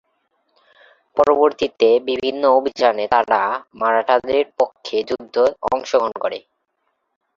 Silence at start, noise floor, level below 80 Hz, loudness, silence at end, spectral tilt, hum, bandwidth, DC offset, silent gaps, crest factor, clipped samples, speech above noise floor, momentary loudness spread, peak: 1.15 s; -71 dBFS; -58 dBFS; -18 LUFS; 1 s; -4 dB/octave; none; 7.4 kHz; under 0.1%; none; 18 dB; under 0.1%; 54 dB; 8 LU; 0 dBFS